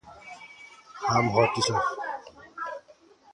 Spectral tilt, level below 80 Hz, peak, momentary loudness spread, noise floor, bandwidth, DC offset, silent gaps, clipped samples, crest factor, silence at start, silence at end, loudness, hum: -4.5 dB/octave; -60 dBFS; -6 dBFS; 22 LU; -56 dBFS; 11.5 kHz; under 0.1%; none; under 0.1%; 22 dB; 0.05 s; 0.55 s; -27 LUFS; none